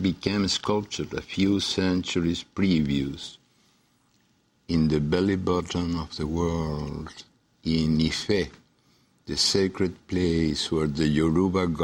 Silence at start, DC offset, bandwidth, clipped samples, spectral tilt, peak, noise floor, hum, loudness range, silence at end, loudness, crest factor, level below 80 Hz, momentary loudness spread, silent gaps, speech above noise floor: 0 s; under 0.1%; 16 kHz; under 0.1%; -5.5 dB/octave; -6 dBFS; -66 dBFS; none; 3 LU; 0 s; -26 LUFS; 20 dB; -44 dBFS; 10 LU; none; 41 dB